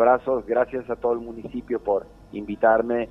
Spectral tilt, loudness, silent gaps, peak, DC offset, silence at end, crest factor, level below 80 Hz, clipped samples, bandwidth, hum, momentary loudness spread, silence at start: -8.5 dB/octave; -24 LUFS; none; -6 dBFS; under 0.1%; 0 s; 18 dB; -52 dBFS; under 0.1%; 5.8 kHz; none; 14 LU; 0 s